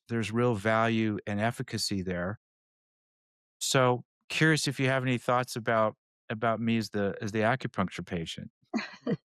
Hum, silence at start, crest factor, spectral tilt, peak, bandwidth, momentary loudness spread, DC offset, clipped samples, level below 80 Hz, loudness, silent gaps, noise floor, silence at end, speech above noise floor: none; 0.1 s; 18 dB; -5 dB/octave; -12 dBFS; 15 kHz; 10 LU; under 0.1%; under 0.1%; -68 dBFS; -29 LUFS; 2.37-3.60 s, 4.05-4.28 s, 5.98-6.28 s, 8.50-8.61 s; under -90 dBFS; 0.1 s; over 61 dB